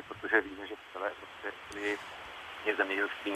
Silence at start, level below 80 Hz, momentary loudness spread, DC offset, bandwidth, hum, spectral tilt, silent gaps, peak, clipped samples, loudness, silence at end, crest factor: 0 s; -68 dBFS; 14 LU; under 0.1%; 14.5 kHz; none; -3.5 dB/octave; none; -10 dBFS; under 0.1%; -35 LUFS; 0 s; 26 dB